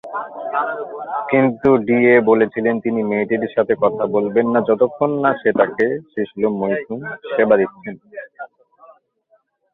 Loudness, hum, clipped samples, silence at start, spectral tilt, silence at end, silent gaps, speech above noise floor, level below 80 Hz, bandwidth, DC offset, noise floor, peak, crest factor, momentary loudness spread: -18 LUFS; none; under 0.1%; 0.05 s; -9.5 dB/octave; 1.3 s; none; 43 dB; -58 dBFS; 4 kHz; under 0.1%; -60 dBFS; -2 dBFS; 16 dB; 14 LU